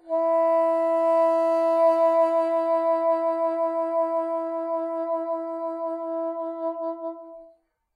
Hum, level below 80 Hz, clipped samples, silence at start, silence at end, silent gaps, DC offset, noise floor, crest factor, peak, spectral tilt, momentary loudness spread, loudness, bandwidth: none; -82 dBFS; under 0.1%; 0.05 s; 0.5 s; none; under 0.1%; -58 dBFS; 12 dB; -12 dBFS; -4 dB/octave; 10 LU; -24 LUFS; 5.2 kHz